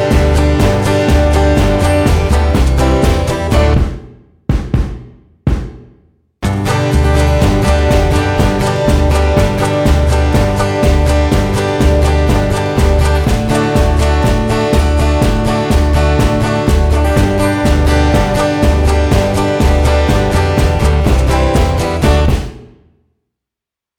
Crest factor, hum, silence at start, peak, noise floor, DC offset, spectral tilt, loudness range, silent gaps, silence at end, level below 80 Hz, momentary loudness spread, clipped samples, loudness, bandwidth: 10 dB; none; 0 s; 0 dBFS; -85 dBFS; under 0.1%; -6.5 dB/octave; 3 LU; none; 1.35 s; -14 dBFS; 4 LU; under 0.1%; -12 LUFS; 15 kHz